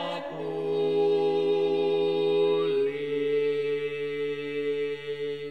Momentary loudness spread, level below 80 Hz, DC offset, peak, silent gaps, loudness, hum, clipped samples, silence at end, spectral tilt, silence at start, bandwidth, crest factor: 9 LU; -74 dBFS; 0.2%; -16 dBFS; none; -27 LUFS; none; under 0.1%; 0 s; -6.5 dB/octave; 0 s; 6 kHz; 10 dB